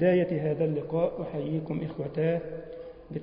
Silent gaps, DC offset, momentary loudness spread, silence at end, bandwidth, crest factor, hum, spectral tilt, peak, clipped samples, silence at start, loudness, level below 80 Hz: none; under 0.1%; 13 LU; 0 s; 5.2 kHz; 16 dB; none; -12 dB/octave; -12 dBFS; under 0.1%; 0 s; -30 LUFS; -58 dBFS